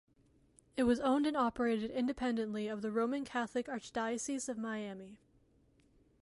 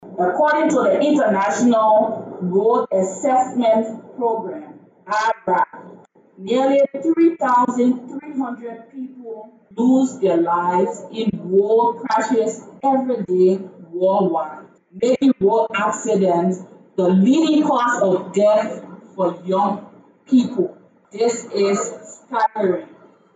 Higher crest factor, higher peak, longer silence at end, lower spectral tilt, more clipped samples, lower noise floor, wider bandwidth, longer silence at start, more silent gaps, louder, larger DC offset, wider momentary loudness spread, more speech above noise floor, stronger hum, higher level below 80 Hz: about the same, 16 dB vs 12 dB; second, -20 dBFS vs -6 dBFS; first, 1.05 s vs 0.5 s; second, -4.5 dB/octave vs -6 dB/octave; neither; first, -70 dBFS vs -46 dBFS; first, 11.5 kHz vs 9.2 kHz; first, 0.75 s vs 0 s; neither; second, -36 LUFS vs -18 LUFS; neither; second, 10 LU vs 13 LU; first, 34 dB vs 28 dB; neither; about the same, -66 dBFS vs -68 dBFS